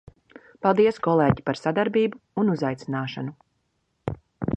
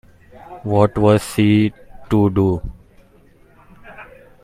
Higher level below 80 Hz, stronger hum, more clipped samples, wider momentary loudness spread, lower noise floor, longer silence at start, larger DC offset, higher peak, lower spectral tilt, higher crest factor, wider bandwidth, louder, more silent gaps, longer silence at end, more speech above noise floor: second, -52 dBFS vs -40 dBFS; neither; neither; second, 15 LU vs 23 LU; first, -72 dBFS vs -50 dBFS; first, 0.65 s vs 0.5 s; neither; second, -4 dBFS vs 0 dBFS; about the same, -8 dB/octave vs -7.5 dB/octave; about the same, 20 dB vs 18 dB; second, 8.6 kHz vs 15 kHz; second, -24 LUFS vs -17 LUFS; neither; second, 0.05 s vs 0.4 s; first, 50 dB vs 34 dB